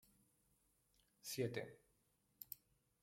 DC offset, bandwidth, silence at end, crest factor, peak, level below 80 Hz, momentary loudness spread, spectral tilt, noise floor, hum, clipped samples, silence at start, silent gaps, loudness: under 0.1%; 16.5 kHz; 0.5 s; 24 dB; -28 dBFS; -82 dBFS; 13 LU; -4.5 dB/octave; -81 dBFS; none; under 0.1%; 1.25 s; none; -49 LUFS